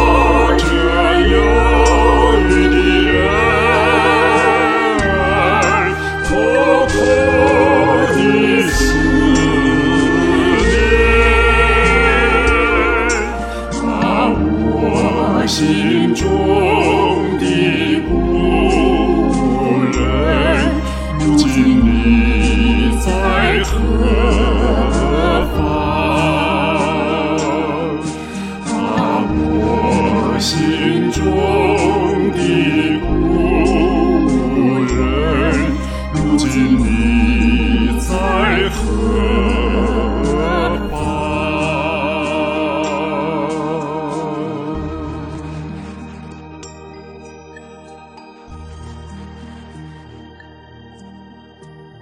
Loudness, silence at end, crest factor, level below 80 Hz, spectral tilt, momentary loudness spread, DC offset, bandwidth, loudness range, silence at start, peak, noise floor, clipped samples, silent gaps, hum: -14 LUFS; 0.2 s; 14 dB; -22 dBFS; -5.5 dB/octave; 11 LU; under 0.1%; 13.5 kHz; 7 LU; 0 s; 0 dBFS; -39 dBFS; under 0.1%; none; none